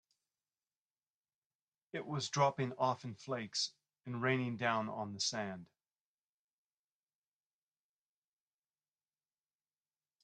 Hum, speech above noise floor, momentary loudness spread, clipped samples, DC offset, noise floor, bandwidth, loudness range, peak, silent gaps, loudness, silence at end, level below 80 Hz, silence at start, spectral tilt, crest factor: none; over 52 dB; 13 LU; under 0.1%; under 0.1%; under -90 dBFS; 10.5 kHz; 8 LU; -18 dBFS; none; -38 LUFS; 4.6 s; -84 dBFS; 1.95 s; -4 dB/octave; 24 dB